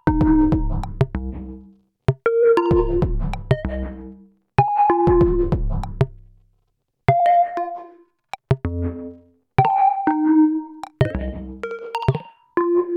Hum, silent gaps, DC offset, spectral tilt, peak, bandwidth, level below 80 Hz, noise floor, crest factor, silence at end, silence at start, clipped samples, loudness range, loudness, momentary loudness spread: none; none; under 0.1%; -9.5 dB/octave; 0 dBFS; 9 kHz; -30 dBFS; -70 dBFS; 20 dB; 0 s; 0.05 s; under 0.1%; 3 LU; -20 LUFS; 15 LU